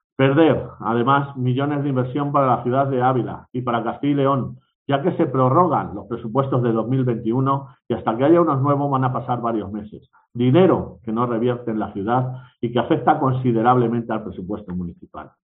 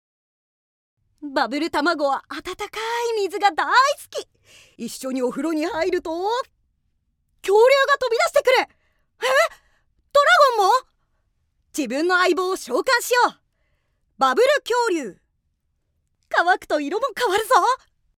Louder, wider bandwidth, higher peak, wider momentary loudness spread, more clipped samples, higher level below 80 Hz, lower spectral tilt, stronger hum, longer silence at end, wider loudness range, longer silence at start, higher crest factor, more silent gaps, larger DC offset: about the same, -20 LUFS vs -20 LUFS; second, 3.9 kHz vs 18 kHz; about the same, -2 dBFS vs -2 dBFS; about the same, 13 LU vs 14 LU; neither; first, -56 dBFS vs -62 dBFS; first, -11 dB/octave vs -2 dB/octave; neither; second, 0.15 s vs 0.4 s; second, 2 LU vs 5 LU; second, 0.2 s vs 1.2 s; about the same, 18 dB vs 20 dB; first, 4.75-4.86 s vs none; neither